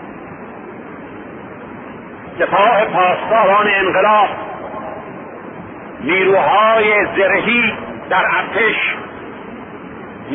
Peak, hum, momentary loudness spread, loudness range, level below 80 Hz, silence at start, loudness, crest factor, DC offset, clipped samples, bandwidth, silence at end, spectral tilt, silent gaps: 0 dBFS; none; 20 LU; 3 LU; -52 dBFS; 0 s; -13 LUFS; 16 dB; under 0.1%; under 0.1%; 3.8 kHz; 0 s; -8.5 dB/octave; none